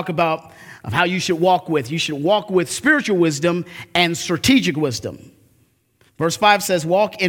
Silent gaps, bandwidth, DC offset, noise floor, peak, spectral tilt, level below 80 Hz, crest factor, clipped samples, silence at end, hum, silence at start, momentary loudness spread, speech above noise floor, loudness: none; 18 kHz; under 0.1%; -60 dBFS; 0 dBFS; -4 dB/octave; -54 dBFS; 20 dB; under 0.1%; 0 s; none; 0 s; 8 LU; 41 dB; -18 LUFS